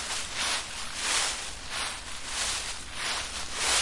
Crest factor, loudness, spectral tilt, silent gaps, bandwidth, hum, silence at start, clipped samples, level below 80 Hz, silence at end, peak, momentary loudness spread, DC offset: 18 dB; -30 LUFS; 0.5 dB/octave; none; 11.5 kHz; none; 0 s; under 0.1%; -48 dBFS; 0 s; -14 dBFS; 8 LU; under 0.1%